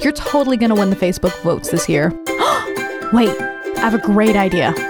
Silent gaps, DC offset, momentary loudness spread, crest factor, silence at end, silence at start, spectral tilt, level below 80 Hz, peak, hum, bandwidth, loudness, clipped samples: none; under 0.1%; 6 LU; 14 dB; 0 s; 0 s; -5 dB/octave; -40 dBFS; -2 dBFS; none; over 20 kHz; -16 LUFS; under 0.1%